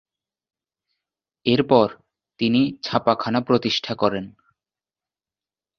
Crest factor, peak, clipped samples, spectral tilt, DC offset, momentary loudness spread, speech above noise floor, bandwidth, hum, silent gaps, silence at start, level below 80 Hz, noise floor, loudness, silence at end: 22 dB; -2 dBFS; under 0.1%; -6.5 dB/octave; under 0.1%; 8 LU; over 70 dB; 6.8 kHz; none; none; 1.45 s; -60 dBFS; under -90 dBFS; -21 LUFS; 1.5 s